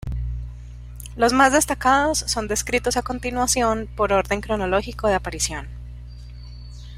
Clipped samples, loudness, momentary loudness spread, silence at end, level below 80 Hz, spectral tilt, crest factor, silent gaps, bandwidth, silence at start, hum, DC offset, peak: under 0.1%; -21 LUFS; 23 LU; 0 s; -34 dBFS; -3.5 dB/octave; 20 dB; none; 16 kHz; 0.05 s; 60 Hz at -35 dBFS; under 0.1%; -2 dBFS